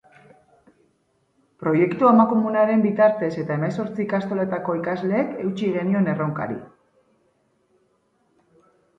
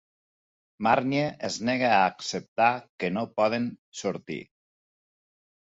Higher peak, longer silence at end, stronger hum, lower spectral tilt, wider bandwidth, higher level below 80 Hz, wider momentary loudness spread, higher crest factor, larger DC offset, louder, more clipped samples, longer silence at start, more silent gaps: first, -4 dBFS vs -8 dBFS; first, 2.3 s vs 1.3 s; neither; first, -9 dB/octave vs -4.5 dB/octave; about the same, 7.4 kHz vs 8 kHz; about the same, -66 dBFS vs -66 dBFS; about the same, 10 LU vs 11 LU; about the same, 18 dB vs 20 dB; neither; first, -21 LUFS vs -27 LUFS; neither; first, 1.6 s vs 0.8 s; second, none vs 2.48-2.56 s, 2.90-2.98 s, 3.78-3.92 s